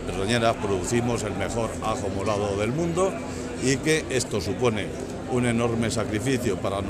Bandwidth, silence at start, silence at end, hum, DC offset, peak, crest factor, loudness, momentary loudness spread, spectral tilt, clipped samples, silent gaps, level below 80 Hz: 15 kHz; 0 s; 0 s; none; under 0.1%; -8 dBFS; 18 dB; -25 LUFS; 5 LU; -5 dB/octave; under 0.1%; none; -44 dBFS